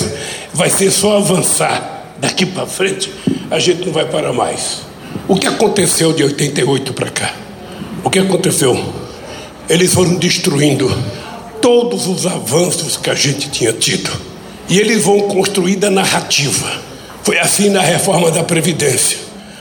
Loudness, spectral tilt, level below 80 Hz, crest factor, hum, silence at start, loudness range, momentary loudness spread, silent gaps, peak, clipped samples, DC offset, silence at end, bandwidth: -13 LUFS; -3.5 dB/octave; -48 dBFS; 14 dB; none; 0 s; 3 LU; 14 LU; none; 0 dBFS; under 0.1%; under 0.1%; 0 s; 18 kHz